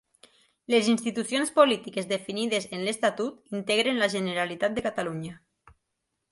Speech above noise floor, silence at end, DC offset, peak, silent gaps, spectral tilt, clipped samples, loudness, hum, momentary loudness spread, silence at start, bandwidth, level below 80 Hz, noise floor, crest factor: 54 dB; 0.95 s; under 0.1%; -6 dBFS; none; -4 dB/octave; under 0.1%; -26 LUFS; none; 11 LU; 0.7 s; 11.5 kHz; -66 dBFS; -81 dBFS; 22 dB